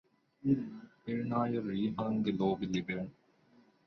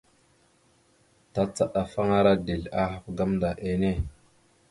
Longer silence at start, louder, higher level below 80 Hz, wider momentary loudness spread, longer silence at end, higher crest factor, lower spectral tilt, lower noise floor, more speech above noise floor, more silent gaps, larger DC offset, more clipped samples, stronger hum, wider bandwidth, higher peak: second, 0.45 s vs 1.35 s; second, -35 LUFS vs -27 LUFS; second, -66 dBFS vs -44 dBFS; about the same, 9 LU vs 8 LU; first, 0.75 s vs 0.6 s; about the same, 18 dB vs 20 dB; about the same, -7.5 dB/octave vs -7 dB/octave; about the same, -66 dBFS vs -64 dBFS; second, 32 dB vs 38 dB; neither; neither; neither; neither; second, 6.4 kHz vs 11.5 kHz; second, -18 dBFS vs -8 dBFS